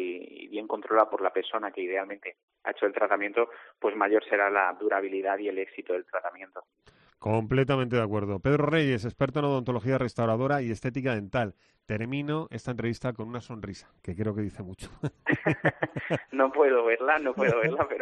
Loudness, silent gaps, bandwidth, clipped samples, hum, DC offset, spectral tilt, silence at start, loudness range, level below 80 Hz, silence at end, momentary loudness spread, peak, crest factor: -28 LUFS; 2.43-2.48 s; 9.6 kHz; under 0.1%; none; under 0.1%; -7.5 dB/octave; 0 s; 6 LU; -58 dBFS; 0 s; 14 LU; -8 dBFS; 20 dB